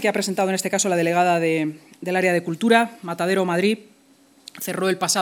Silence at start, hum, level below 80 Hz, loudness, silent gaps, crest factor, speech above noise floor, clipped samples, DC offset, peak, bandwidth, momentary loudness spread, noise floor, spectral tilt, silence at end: 0 s; none; -76 dBFS; -21 LUFS; none; 20 dB; 34 dB; under 0.1%; under 0.1%; -2 dBFS; 19.5 kHz; 10 LU; -55 dBFS; -4 dB/octave; 0 s